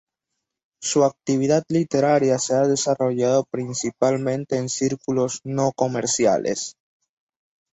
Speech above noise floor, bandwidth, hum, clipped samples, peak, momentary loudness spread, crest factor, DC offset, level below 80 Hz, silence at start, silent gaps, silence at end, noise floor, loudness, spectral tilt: 60 dB; 8.4 kHz; none; under 0.1%; -4 dBFS; 7 LU; 18 dB; under 0.1%; -62 dBFS; 0.8 s; none; 1.05 s; -81 dBFS; -21 LUFS; -5 dB/octave